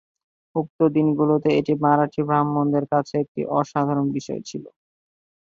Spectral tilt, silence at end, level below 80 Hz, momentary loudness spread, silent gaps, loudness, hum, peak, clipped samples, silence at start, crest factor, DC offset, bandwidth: -8 dB/octave; 0.75 s; -62 dBFS; 10 LU; 0.70-0.79 s, 3.28-3.35 s; -22 LUFS; none; -4 dBFS; under 0.1%; 0.55 s; 18 dB; under 0.1%; 7.6 kHz